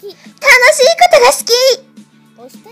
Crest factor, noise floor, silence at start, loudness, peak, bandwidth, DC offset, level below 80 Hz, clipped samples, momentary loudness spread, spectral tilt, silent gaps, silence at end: 10 dB; -41 dBFS; 0.05 s; -8 LUFS; 0 dBFS; over 20 kHz; under 0.1%; -50 dBFS; 1%; 8 LU; 1 dB/octave; none; 0.25 s